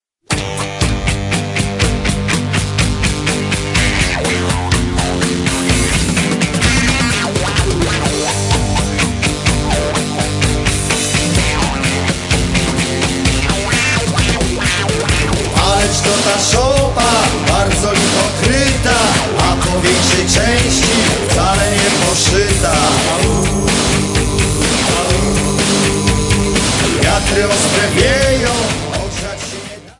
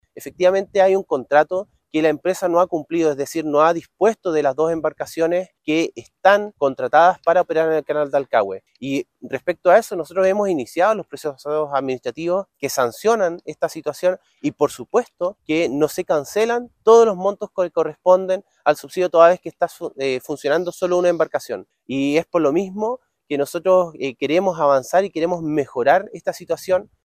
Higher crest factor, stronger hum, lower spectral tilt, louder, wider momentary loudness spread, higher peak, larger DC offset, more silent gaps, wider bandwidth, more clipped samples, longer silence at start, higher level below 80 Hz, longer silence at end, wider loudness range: about the same, 14 dB vs 18 dB; neither; second, -3.5 dB/octave vs -5 dB/octave; first, -13 LUFS vs -19 LUFS; second, 5 LU vs 10 LU; about the same, 0 dBFS vs 0 dBFS; neither; neither; second, 11.5 kHz vs 15.5 kHz; neither; first, 0.3 s vs 0.15 s; first, -24 dBFS vs -62 dBFS; about the same, 0.1 s vs 0.2 s; about the same, 3 LU vs 4 LU